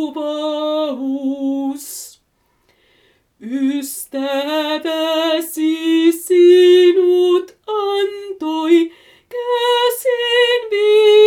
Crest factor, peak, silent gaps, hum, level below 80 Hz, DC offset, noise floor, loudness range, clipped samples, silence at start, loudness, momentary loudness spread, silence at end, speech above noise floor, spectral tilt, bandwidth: 14 dB; -2 dBFS; none; none; -70 dBFS; under 0.1%; -62 dBFS; 10 LU; under 0.1%; 0 s; -16 LUFS; 14 LU; 0 s; 47 dB; -2 dB/octave; 17 kHz